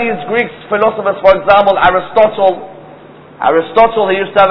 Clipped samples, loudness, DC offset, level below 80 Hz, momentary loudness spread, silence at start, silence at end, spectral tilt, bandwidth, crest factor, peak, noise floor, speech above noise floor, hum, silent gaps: 0.8%; -11 LUFS; under 0.1%; -40 dBFS; 8 LU; 0 s; 0 s; -7 dB/octave; 5.4 kHz; 12 dB; 0 dBFS; -36 dBFS; 25 dB; none; none